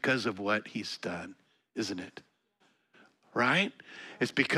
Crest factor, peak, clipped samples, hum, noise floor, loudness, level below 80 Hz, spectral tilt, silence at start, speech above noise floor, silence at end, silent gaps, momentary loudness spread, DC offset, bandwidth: 24 dB; -10 dBFS; under 0.1%; none; -71 dBFS; -32 LUFS; -76 dBFS; -4.5 dB/octave; 0.05 s; 39 dB; 0 s; none; 20 LU; under 0.1%; 14 kHz